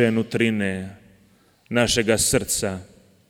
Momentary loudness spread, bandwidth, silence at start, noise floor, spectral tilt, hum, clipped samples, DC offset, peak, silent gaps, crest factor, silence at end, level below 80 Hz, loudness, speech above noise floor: 13 LU; 17.5 kHz; 0 s; -58 dBFS; -3.5 dB/octave; none; under 0.1%; under 0.1%; -4 dBFS; none; 18 dB; 0.45 s; -46 dBFS; -21 LUFS; 36 dB